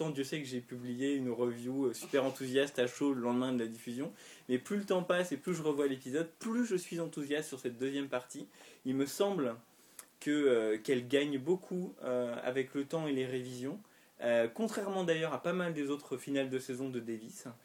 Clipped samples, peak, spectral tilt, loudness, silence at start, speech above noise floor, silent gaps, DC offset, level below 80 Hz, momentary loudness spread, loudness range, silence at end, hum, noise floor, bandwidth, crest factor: under 0.1%; -18 dBFS; -5 dB/octave; -36 LUFS; 0 s; 22 dB; none; under 0.1%; -84 dBFS; 10 LU; 3 LU; 0.1 s; none; -58 dBFS; 19 kHz; 18 dB